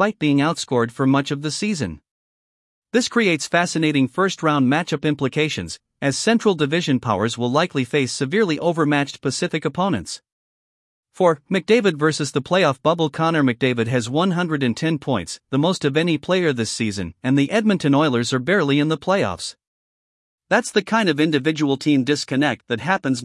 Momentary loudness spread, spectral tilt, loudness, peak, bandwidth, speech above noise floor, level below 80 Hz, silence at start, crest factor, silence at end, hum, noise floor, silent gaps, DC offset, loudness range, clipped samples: 6 LU; -5 dB/octave; -20 LUFS; -2 dBFS; 12 kHz; over 71 dB; -60 dBFS; 0 s; 18 dB; 0 s; none; under -90 dBFS; 2.11-2.82 s, 10.32-11.03 s, 19.67-20.38 s; under 0.1%; 2 LU; under 0.1%